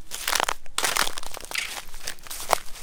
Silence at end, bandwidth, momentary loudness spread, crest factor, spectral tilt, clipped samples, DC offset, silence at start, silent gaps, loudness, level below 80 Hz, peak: 0 s; 19 kHz; 12 LU; 26 dB; 0 dB/octave; under 0.1%; under 0.1%; 0 s; none; -27 LUFS; -42 dBFS; 0 dBFS